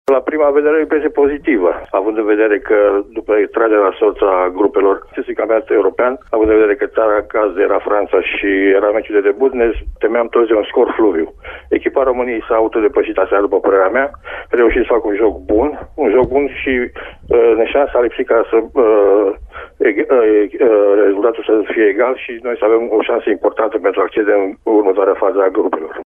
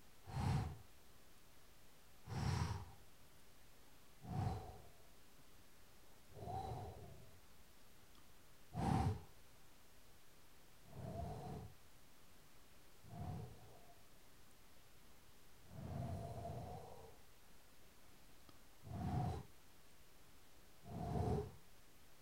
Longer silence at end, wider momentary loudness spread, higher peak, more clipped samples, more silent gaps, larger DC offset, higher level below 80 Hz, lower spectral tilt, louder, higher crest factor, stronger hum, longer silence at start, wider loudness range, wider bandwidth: about the same, 0.05 s vs 0 s; second, 6 LU vs 23 LU; first, -2 dBFS vs -26 dBFS; neither; neither; neither; first, -38 dBFS vs -60 dBFS; first, -8 dB/octave vs -6.5 dB/octave; first, -14 LUFS vs -47 LUFS; second, 12 dB vs 24 dB; neither; about the same, 0.1 s vs 0 s; second, 2 LU vs 9 LU; second, 3.6 kHz vs 16 kHz